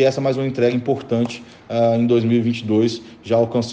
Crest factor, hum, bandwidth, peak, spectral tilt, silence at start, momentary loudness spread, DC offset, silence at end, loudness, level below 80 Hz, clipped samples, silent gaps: 14 dB; none; 8.6 kHz; -4 dBFS; -7 dB/octave; 0 s; 8 LU; under 0.1%; 0 s; -19 LUFS; -60 dBFS; under 0.1%; none